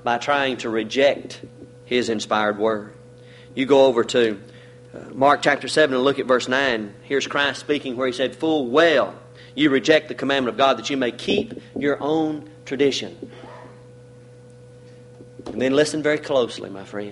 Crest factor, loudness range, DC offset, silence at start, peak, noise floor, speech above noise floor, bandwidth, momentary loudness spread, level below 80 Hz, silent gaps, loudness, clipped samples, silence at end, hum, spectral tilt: 18 dB; 7 LU; under 0.1%; 0.05 s; -4 dBFS; -45 dBFS; 24 dB; 11.5 kHz; 17 LU; -60 dBFS; none; -20 LUFS; under 0.1%; 0 s; none; -4 dB/octave